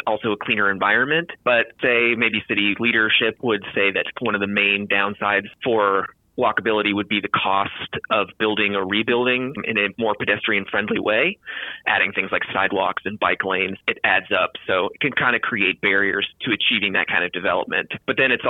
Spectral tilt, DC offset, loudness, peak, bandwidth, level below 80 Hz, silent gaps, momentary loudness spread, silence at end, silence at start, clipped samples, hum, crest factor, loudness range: -7 dB/octave; under 0.1%; -20 LUFS; -6 dBFS; 4.3 kHz; -62 dBFS; none; 5 LU; 0 s; 0.05 s; under 0.1%; none; 16 dB; 2 LU